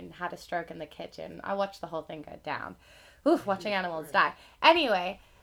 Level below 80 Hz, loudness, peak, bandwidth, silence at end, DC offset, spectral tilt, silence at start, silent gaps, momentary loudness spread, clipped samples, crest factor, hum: -64 dBFS; -29 LUFS; -6 dBFS; 17 kHz; 0.25 s; under 0.1%; -4.5 dB/octave; 0 s; none; 19 LU; under 0.1%; 26 dB; none